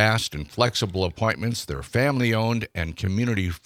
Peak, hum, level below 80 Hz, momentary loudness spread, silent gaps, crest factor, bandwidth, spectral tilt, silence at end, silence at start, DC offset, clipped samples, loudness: -4 dBFS; none; -46 dBFS; 7 LU; none; 20 dB; 16 kHz; -5 dB/octave; 0.1 s; 0 s; under 0.1%; under 0.1%; -24 LUFS